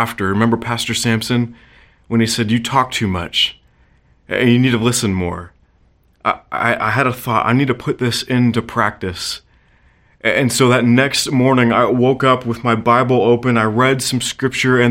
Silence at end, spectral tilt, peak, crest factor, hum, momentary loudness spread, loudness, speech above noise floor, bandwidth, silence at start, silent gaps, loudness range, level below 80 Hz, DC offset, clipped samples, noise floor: 0 s; -5 dB/octave; 0 dBFS; 16 dB; none; 8 LU; -16 LUFS; 39 dB; 17 kHz; 0 s; none; 5 LU; -48 dBFS; under 0.1%; under 0.1%; -54 dBFS